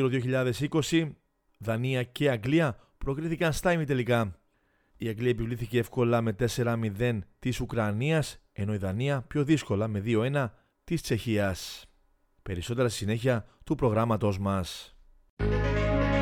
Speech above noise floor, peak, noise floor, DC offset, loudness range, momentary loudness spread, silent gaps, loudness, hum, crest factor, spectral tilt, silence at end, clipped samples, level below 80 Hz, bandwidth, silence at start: 42 dB; -12 dBFS; -70 dBFS; under 0.1%; 2 LU; 10 LU; 15.30-15.37 s; -29 LUFS; none; 16 dB; -6.5 dB/octave; 0 s; under 0.1%; -44 dBFS; 18 kHz; 0 s